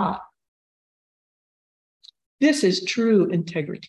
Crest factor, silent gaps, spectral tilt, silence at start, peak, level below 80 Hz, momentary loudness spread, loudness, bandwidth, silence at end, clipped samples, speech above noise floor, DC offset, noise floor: 18 dB; 0.48-2.00 s, 2.26-2.38 s; -5 dB/octave; 0 s; -8 dBFS; -64 dBFS; 9 LU; -21 LUFS; 12 kHz; 0 s; under 0.1%; over 69 dB; under 0.1%; under -90 dBFS